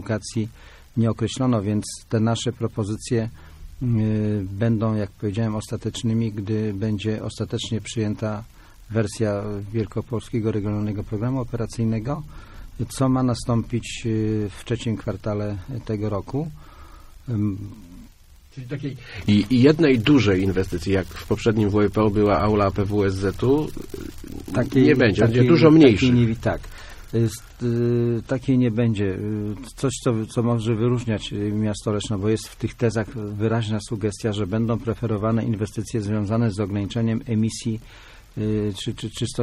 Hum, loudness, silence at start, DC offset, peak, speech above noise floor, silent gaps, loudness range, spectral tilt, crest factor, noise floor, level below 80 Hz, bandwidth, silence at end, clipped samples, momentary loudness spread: none; -23 LUFS; 0 s; under 0.1%; -2 dBFS; 27 dB; none; 9 LU; -7 dB/octave; 20 dB; -49 dBFS; -42 dBFS; 13.5 kHz; 0 s; under 0.1%; 12 LU